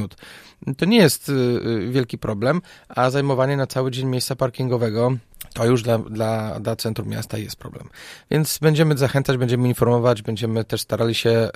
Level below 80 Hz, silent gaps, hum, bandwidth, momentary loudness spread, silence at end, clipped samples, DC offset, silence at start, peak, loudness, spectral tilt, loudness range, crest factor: -50 dBFS; none; none; 15.5 kHz; 12 LU; 0.05 s; under 0.1%; under 0.1%; 0 s; 0 dBFS; -21 LUFS; -6 dB/octave; 4 LU; 20 dB